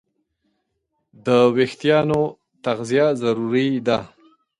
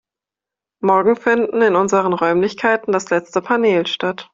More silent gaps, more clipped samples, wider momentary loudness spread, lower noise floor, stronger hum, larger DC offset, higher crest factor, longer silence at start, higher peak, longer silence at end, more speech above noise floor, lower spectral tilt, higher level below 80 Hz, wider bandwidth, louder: neither; neither; first, 10 LU vs 5 LU; second, -74 dBFS vs -87 dBFS; neither; neither; about the same, 16 dB vs 16 dB; first, 1.25 s vs 0.85 s; about the same, -4 dBFS vs -2 dBFS; first, 0.55 s vs 0.1 s; second, 55 dB vs 71 dB; first, -6.5 dB/octave vs -5 dB/octave; about the same, -58 dBFS vs -60 dBFS; first, 11.5 kHz vs 7.8 kHz; second, -20 LUFS vs -17 LUFS